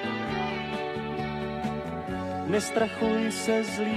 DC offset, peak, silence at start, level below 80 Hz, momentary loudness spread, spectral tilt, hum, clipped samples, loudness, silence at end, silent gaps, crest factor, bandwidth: under 0.1%; -12 dBFS; 0 s; -52 dBFS; 6 LU; -5 dB/octave; none; under 0.1%; -29 LUFS; 0 s; none; 16 dB; 14 kHz